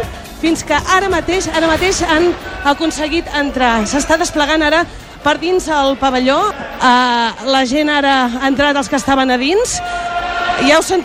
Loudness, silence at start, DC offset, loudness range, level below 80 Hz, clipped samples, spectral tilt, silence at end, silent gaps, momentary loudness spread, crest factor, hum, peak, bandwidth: -14 LUFS; 0 s; under 0.1%; 1 LU; -34 dBFS; under 0.1%; -3 dB/octave; 0 s; none; 6 LU; 14 dB; none; 0 dBFS; 16 kHz